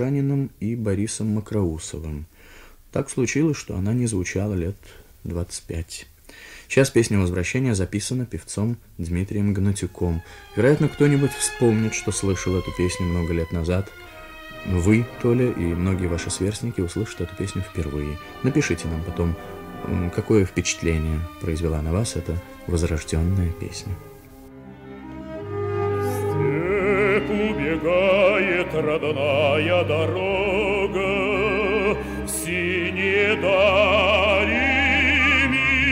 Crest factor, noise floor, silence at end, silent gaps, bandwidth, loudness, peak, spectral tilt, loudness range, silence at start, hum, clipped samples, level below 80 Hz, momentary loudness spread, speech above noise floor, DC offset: 18 dB; -46 dBFS; 0 s; none; 16 kHz; -22 LUFS; -4 dBFS; -5 dB/octave; 7 LU; 0 s; none; under 0.1%; -38 dBFS; 14 LU; 23 dB; under 0.1%